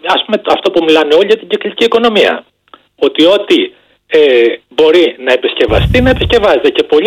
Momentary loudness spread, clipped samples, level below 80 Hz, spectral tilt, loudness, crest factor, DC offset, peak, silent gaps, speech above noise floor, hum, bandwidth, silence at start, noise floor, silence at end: 5 LU; under 0.1%; -28 dBFS; -5.5 dB/octave; -10 LUFS; 10 dB; under 0.1%; 0 dBFS; none; 34 dB; none; 12 kHz; 0.05 s; -43 dBFS; 0 s